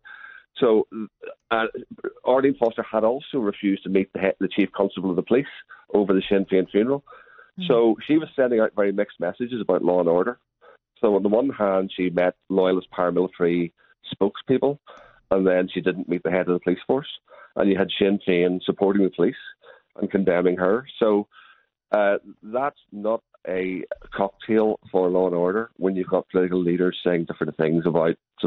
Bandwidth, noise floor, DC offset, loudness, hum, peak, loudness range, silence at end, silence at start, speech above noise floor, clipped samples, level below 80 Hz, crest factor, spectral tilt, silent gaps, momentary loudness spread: 4.3 kHz; -56 dBFS; under 0.1%; -23 LUFS; none; -6 dBFS; 2 LU; 0 s; 0.1 s; 34 dB; under 0.1%; -60 dBFS; 18 dB; -9.5 dB/octave; none; 10 LU